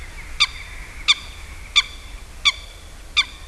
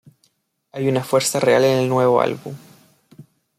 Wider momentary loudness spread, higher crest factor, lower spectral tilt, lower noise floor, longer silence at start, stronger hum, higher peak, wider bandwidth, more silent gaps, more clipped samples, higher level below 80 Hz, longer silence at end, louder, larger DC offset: about the same, 20 LU vs 20 LU; first, 24 dB vs 18 dB; second, 0.5 dB/octave vs -5 dB/octave; second, -38 dBFS vs -65 dBFS; second, 0 s vs 0.75 s; neither; about the same, -2 dBFS vs -4 dBFS; second, 12 kHz vs 15.5 kHz; neither; neither; first, -38 dBFS vs -64 dBFS; second, 0 s vs 0.35 s; about the same, -19 LUFS vs -18 LUFS; first, 0.2% vs under 0.1%